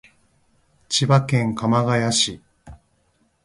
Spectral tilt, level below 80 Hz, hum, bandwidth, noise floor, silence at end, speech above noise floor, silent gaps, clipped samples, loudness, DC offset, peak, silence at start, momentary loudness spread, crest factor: -4.5 dB/octave; -54 dBFS; none; 11.5 kHz; -64 dBFS; 0.7 s; 45 dB; none; under 0.1%; -19 LUFS; under 0.1%; -2 dBFS; 0.9 s; 5 LU; 20 dB